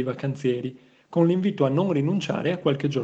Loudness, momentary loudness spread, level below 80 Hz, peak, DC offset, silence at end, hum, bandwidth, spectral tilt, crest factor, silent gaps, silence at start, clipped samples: -24 LUFS; 7 LU; -66 dBFS; -8 dBFS; under 0.1%; 0 s; none; 8 kHz; -7.5 dB/octave; 16 dB; none; 0 s; under 0.1%